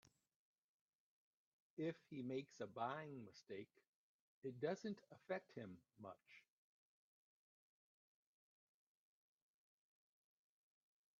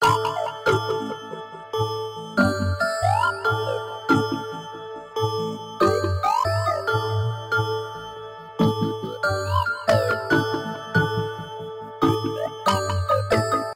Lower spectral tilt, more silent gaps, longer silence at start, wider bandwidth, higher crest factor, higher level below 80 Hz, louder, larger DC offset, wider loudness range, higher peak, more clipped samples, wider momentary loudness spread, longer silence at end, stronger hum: about the same, -5.5 dB/octave vs -5.5 dB/octave; first, 3.87-4.42 s vs none; first, 1.75 s vs 0 s; second, 7.2 kHz vs 16 kHz; first, 24 dB vs 18 dB; second, under -90 dBFS vs -50 dBFS; second, -52 LUFS vs -23 LUFS; neither; first, 13 LU vs 1 LU; second, -32 dBFS vs -6 dBFS; neither; about the same, 13 LU vs 13 LU; first, 4.8 s vs 0 s; neither